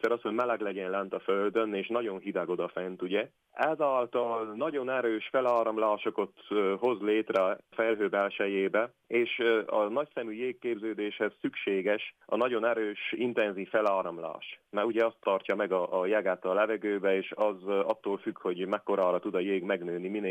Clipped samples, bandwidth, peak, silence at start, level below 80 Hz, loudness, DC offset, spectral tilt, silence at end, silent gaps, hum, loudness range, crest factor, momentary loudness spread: under 0.1%; 16 kHz; -14 dBFS; 0.05 s; -86 dBFS; -30 LUFS; under 0.1%; -6.5 dB/octave; 0 s; none; none; 2 LU; 16 dB; 6 LU